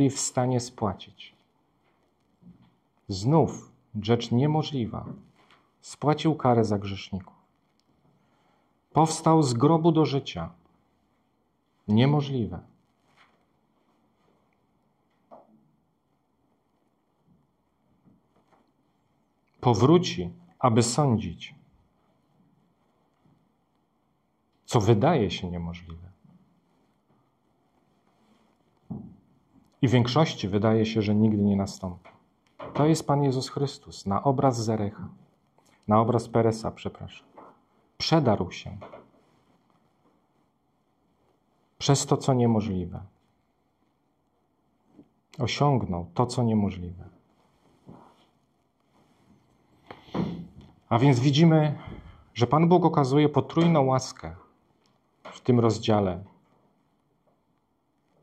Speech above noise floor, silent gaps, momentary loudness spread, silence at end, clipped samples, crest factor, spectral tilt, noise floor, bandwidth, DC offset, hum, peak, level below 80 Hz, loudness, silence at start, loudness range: 48 dB; none; 20 LU; 1.95 s; under 0.1%; 22 dB; -6.5 dB/octave; -72 dBFS; 13 kHz; under 0.1%; none; -6 dBFS; -58 dBFS; -25 LUFS; 0 s; 8 LU